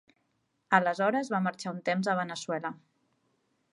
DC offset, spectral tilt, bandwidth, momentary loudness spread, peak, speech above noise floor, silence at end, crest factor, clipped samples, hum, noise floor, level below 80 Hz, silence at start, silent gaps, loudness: under 0.1%; -5.5 dB/octave; 11.5 kHz; 9 LU; -8 dBFS; 47 dB; 0.95 s; 24 dB; under 0.1%; none; -76 dBFS; -82 dBFS; 0.7 s; none; -30 LUFS